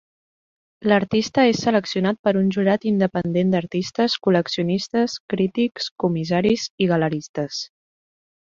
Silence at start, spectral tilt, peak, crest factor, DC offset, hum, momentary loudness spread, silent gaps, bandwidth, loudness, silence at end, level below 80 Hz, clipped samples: 0.8 s; -6 dB/octave; -4 dBFS; 18 dB; under 0.1%; none; 7 LU; 2.19-2.24 s, 5.20-5.28 s, 5.91-5.96 s, 6.70-6.78 s, 7.29-7.34 s; 7.6 kHz; -21 LUFS; 0.9 s; -58 dBFS; under 0.1%